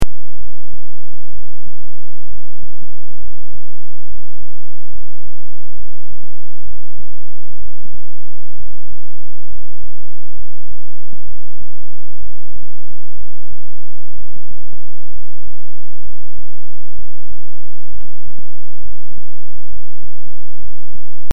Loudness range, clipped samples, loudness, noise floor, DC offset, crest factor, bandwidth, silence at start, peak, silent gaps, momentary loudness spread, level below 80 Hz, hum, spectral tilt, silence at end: 1 LU; under 0.1%; -46 LUFS; -49 dBFS; 90%; 28 dB; 12 kHz; 0 s; 0 dBFS; none; 7 LU; -42 dBFS; none; -8 dB/octave; 0.35 s